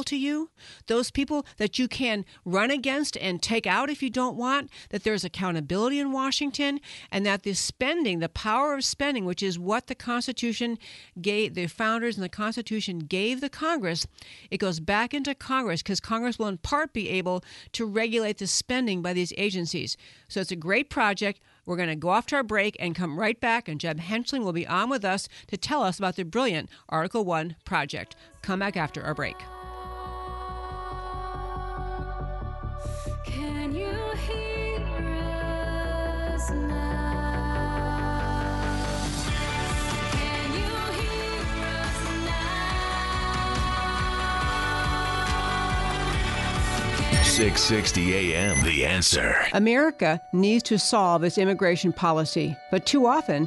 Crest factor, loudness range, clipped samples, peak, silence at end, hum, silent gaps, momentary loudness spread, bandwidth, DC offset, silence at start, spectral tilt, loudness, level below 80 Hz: 18 dB; 10 LU; under 0.1%; -8 dBFS; 0 s; none; none; 13 LU; 11.5 kHz; under 0.1%; 0 s; -4 dB/octave; -27 LUFS; -36 dBFS